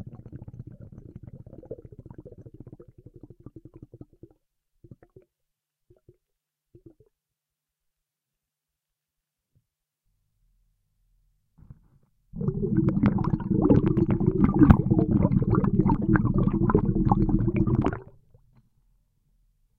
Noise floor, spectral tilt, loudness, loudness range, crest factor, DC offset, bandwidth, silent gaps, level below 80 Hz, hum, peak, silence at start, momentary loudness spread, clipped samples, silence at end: -87 dBFS; -11.5 dB/octave; -23 LUFS; 24 LU; 26 dB; under 0.1%; 4.3 kHz; none; -38 dBFS; none; 0 dBFS; 0 s; 26 LU; under 0.1%; 1.75 s